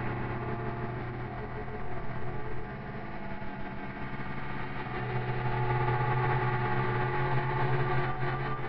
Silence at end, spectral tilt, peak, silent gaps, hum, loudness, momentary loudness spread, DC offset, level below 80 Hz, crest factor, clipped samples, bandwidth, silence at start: 0 s; -6 dB/octave; -16 dBFS; none; none; -33 LUFS; 11 LU; under 0.1%; -46 dBFS; 14 dB; under 0.1%; 5.4 kHz; 0 s